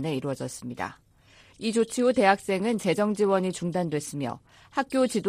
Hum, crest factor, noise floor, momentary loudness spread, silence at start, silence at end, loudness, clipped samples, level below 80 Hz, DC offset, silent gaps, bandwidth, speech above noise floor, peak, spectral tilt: none; 20 dB; -56 dBFS; 13 LU; 0 s; 0 s; -27 LUFS; under 0.1%; -64 dBFS; under 0.1%; none; 15.5 kHz; 30 dB; -8 dBFS; -5 dB/octave